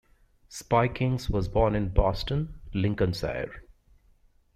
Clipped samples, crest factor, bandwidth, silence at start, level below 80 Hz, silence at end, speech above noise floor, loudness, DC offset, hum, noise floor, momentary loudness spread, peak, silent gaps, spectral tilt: under 0.1%; 20 dB; 14 kHz; 0.5 s; -38 dBFS; 0.95 s; 35 dB; -28 LUFS; under 0.1%; none; -61 dBFS; 10 LU; -8 dBFS; none; -7 dB/octave